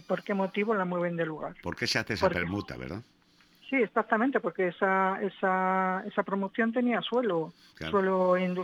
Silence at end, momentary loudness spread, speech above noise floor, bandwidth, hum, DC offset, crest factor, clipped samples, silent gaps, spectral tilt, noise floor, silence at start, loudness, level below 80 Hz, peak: 0 s; 10 LU; 33 dB; 15 kHz; none; under 0.1%; 20 dB; under 0.1%; none; -6 dB/octave; -62 dBFS; 0.1 s; -29 LUFS; -60 dBFS; -10 dBFS